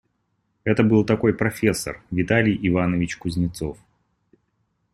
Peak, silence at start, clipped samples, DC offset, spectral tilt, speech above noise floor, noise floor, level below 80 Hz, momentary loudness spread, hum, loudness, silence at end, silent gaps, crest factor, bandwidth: -4 dBFS; 0.65 s; under 0.1%; under 0.1%; -6.5 dB/octave; 50 dB; -71 dBFS; -48 dBFS; 10 LU; none; -22 LUFS; 1.2 s; none; 20 dB; 14.5 kHz